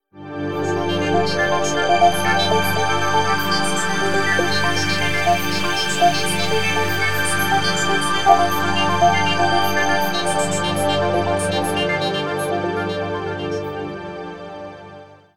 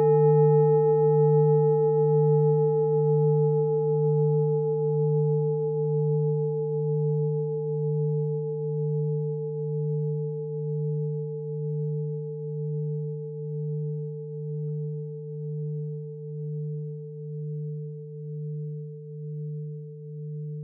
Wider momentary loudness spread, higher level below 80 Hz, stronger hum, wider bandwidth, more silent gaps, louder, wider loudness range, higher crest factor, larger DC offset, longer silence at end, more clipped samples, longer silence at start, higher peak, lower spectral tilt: second, 10 LU vs 15 LU; first, -48 dBFS vs under -90 dBFS; first, 50 Hz at -50 dBFS vs none; first, 18.5 kHz vs 2 kHz; neither; first, -19 LUFS vs -26 LUFS; second, 5 LU vs 13 LU; about the same, 18 dB vs 14 dB; first, 5% vs under 0.1%; about the same, 0 s vs 0 s; neither; about the same, 0 s vs 0 s; first, 0 dBFS vs -12 dBFS; second, -3.5 dB/octave vs -11.5 dB/octave